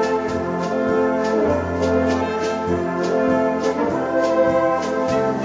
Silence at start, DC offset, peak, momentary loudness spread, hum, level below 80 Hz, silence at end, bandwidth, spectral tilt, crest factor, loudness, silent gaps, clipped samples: 0 s; under 0.1%; -6 dBFS; 4 LU; none; -50 dBFS; 0 s; 9.4 kHz; -6.5 dB/octave; 14 dB; -20 LUFS; none; under 0.1%